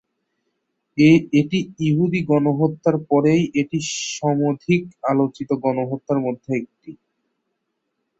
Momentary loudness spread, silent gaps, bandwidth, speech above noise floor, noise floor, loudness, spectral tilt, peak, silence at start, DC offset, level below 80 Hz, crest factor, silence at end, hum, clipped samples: 8 LU; none; 8 kHz; 56 dB; -75 dBFS; -20 LUFS; -6.5 dB/octave; -2 dBFS; 0.95 s; under 0.1%; -58 dBFS; 18 dB; 1.25 s; none; under 0.1%